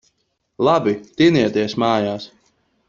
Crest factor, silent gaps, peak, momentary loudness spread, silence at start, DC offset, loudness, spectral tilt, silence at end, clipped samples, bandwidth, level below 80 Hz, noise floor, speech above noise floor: 16 dB; none; -2 dBFS; 11 LU; 0.6 s; under 0.1%; -18 LUFS; -6.5 dB/octave; 0.6 s; under 0.1%; 7.4 kHz; -54 dBFS; -68 dBFS; 50 dB